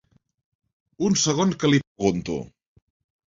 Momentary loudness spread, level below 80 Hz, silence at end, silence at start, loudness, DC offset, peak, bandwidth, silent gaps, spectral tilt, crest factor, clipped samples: 12 LU; -54 dBFS; 0.8 s; 1 s; -23 LUFS; under 0.1%; -6 dBFS; 7.8 kHz; 1.87-1.95 s; -4.5 dB/octave; 20 dB; under 0.1%